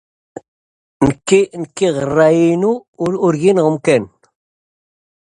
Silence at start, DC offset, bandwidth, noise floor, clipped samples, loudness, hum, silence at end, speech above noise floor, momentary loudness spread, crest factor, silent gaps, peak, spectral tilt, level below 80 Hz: 1 s; under 0.1%; 11 kHz; under -90 dBFS; under 0.1%; -15 LUFS; none; 1.15 s; over 76 dB; 8 LU; 16 dB; 2.88-2.93 s; 0 dBFS; -6 dB/octave; -48 dBFS